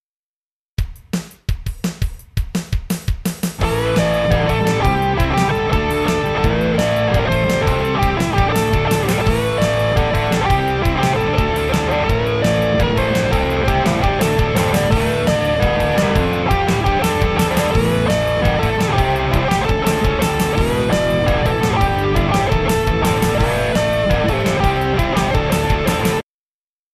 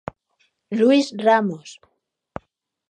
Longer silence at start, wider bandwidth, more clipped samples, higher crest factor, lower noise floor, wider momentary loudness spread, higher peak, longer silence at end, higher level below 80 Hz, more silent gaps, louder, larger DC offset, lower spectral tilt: about the same, 0.8 s vs 0.7 s; first, 14 kHz vs 9.8 kHz; neither; about the same, 16 dB vs 20 dB; first, under -90 dBFS vs -67 dBFS; second, 7 LU vs 22 LU; about the same, -2 dBFS vs -4 dBFS; second, 0.7 s vs 1.2 s; first, -24 dBFS vs -60 dBFS; neither; about the same, -17 LUFS vs -19 LUFS; neither; about the same, -5.5 dB/octave vs -5.5 dB/octave